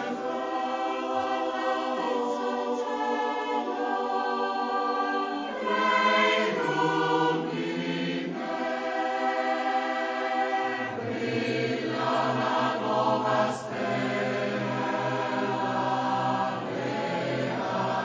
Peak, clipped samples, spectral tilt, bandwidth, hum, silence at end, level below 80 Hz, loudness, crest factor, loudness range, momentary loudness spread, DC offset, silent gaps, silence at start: -12 dBFS; under 0.1%; -5.5 dB/octave; 8 kHz; none; 0 s; -72 dBFS; -28 LUFS; 16 dB; 3 LU; 5 LU; under 0.1%; none; 0 s